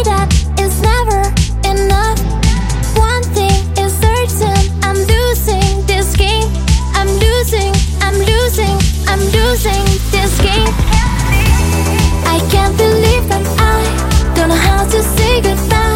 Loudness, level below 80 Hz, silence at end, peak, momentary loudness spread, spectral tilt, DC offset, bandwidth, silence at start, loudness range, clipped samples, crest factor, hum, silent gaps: -12 LUFS; -14 dBFS; 0 s; 0 dBFS; 3 LU; -4.5 dB/octave; under 0.1%; 17 kHz; 0 s; 1 LU; under 0.1%; 12 dB; none; none